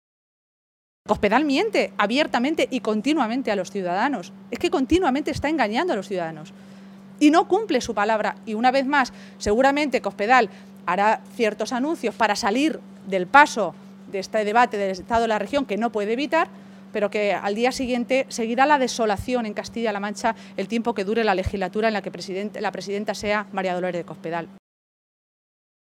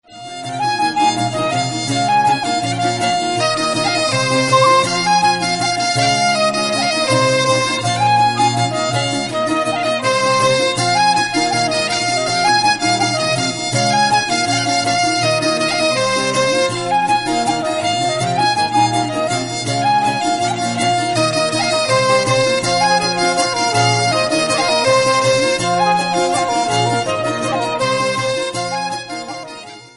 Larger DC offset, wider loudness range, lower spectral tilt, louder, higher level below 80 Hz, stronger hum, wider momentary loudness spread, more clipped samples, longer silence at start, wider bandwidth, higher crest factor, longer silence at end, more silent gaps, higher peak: neither; about the same, 4 LU vs 2 LU; about the same, -4.5 dB/octave vs -3.5 dB/octave; second, -22 LUFS vs -15 LUFS; about the same, -50 dBFS vs -52 dBFS; neither; first, 10 LU vs 5 LU; neither; first, 1.05 s vs 0.1 s; first, 16 kHz vs 11.5 kHz; first, 22 dB vs 16 dB; first, 1.4 s vs 0.1 s; neither; about the same, 0 dBFS vs 0 dBFS